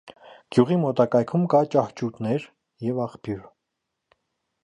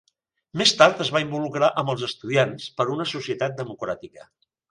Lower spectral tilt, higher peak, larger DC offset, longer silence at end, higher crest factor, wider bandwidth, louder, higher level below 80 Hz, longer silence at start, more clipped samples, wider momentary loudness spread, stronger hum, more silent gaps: first, -8.5 dB/octave vs -4 dB/octave; second, -4 dBFS vs 0 dBFS; neither; first, 1.2 s vs 0.5 s; about the same, 20 dB vs 24 dB; about the same, 10.5 kHz vs 11.5 kHz; about the same, -24 LUFS vs -22 LUFS; about the same, -62 dBFS vs -64 dBFS; second, 0.05 s vs 0.55 s; neither; about the same, 12 LU vs 14 LU; neither; neither